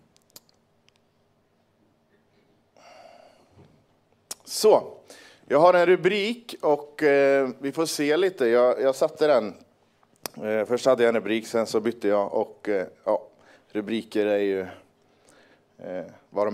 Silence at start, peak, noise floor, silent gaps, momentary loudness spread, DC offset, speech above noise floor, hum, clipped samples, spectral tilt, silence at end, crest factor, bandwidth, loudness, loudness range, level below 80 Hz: 4.45 s; -4 dBFS; -66 dBFS; none; 17 LU; under 0.1%; 43 dB; none; under 0.1%; -4.5 dB/octave; 0 s; 22 dB; 16 kHz; -23 LUFS; 7 LU; -76 dBFS